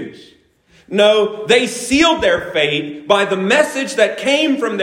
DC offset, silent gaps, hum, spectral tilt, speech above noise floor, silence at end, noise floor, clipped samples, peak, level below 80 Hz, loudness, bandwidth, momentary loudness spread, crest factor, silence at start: under 0.1%; none; none; -3.5 dB/octave; 38 dB; 0 s; -52 dBFS; under 0.1%; 0 dBFS; -48 dBFS; -15 LUFS; 16 kHz; 5 LU; 16 dB; 0 s